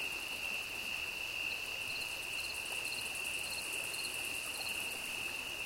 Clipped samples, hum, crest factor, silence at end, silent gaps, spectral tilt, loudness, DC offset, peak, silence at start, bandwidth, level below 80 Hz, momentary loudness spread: under 0.1%; none; 16 dB; 0 s; none; 0 dB/octave; -37 LUFS; under 0.1%; -24 dBFS; 0 s; 17 kHz; -64 dBFS; 1 LU